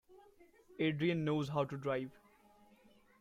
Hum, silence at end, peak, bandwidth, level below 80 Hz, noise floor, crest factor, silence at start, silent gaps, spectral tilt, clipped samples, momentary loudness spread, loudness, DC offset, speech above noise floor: none; 1.1 s; -22 dBFS; 13.5 kHz; -74 dBFS; -66 dBFS; 18 dB; 0.1 s; none; -7.5 dB/octave; under 0.1%; 10 LU; -37 LUFS; under 0.1%; 30 dB